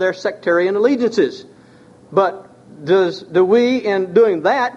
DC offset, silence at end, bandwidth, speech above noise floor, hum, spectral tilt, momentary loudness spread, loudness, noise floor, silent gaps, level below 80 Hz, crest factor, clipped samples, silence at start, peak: under 0.1%; 0 s; 7.8 kHz; 30 dB; none; -6 dB/octave; 7 LU; -16 LUFS; -45 dBFS; none; -64 dBFS; 16 dB; under 0.1%; 0 s; -2 dBFS